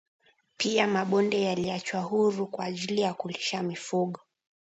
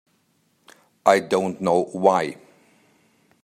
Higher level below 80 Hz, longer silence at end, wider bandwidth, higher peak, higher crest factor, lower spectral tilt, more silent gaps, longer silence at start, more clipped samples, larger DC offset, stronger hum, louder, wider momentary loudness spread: about the same, -70 dBFS vs -70 dBFS; second, 0.6 s vs 1.1 s; second, 8.2 kHz vs 14 kHz; second, -10 dBFS vs -2 dBFS; about the same, 18 dB vs 22 dB; about the same, -4.5 dB/octave vs -5.5 dB/octave; neither; second, 0.6 s vs 1.05 s; neither; neither; neither; second, -28 LUFS vs -21 LUFS; first, 8 LU vs 5 LU